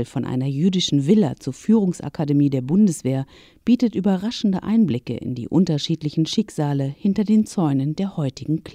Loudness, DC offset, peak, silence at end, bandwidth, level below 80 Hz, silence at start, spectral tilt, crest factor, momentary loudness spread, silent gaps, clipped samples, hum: -21 LUFS; under 0.1%; -6 dBFS; 0.05 s; 13 kHz; -54 dBFS; 0 s; -7 dB/octave; 16 dB; 8 LU; none; under 0.1%; none